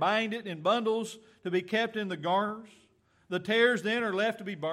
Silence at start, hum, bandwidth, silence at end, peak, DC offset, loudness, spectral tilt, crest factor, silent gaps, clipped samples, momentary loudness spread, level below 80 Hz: 0 s; none; 14 kHz; 0 s; -10 dBFS; under 0.1%; -30 LUFS; -5 dB/octave; 20 dB; none; under 0.1%; 11 LU; -80 dBFS